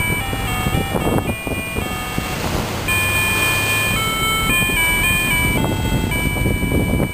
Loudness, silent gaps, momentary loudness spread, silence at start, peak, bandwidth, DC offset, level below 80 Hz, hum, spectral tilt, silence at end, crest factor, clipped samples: -18 LUFS; none; 8 LU; 0 s; -2 dBFS; 15.5 kHz; 0.4%; -28 dBFS; none; -3.5 dB/octave; 0 s; 16 dB; under 0.1%